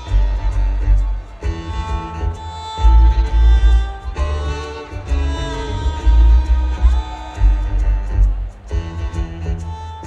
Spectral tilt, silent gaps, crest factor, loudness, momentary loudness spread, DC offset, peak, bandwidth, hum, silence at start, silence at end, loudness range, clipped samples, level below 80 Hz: -6.5 dB/octave; none; 14 dB; -19 LUFS; 12 LU; under 0.1%; -2 dBFS; 7.6 kHz; none; 0 s; 0 s; 2 LU; under 0.1%; -16 dBFS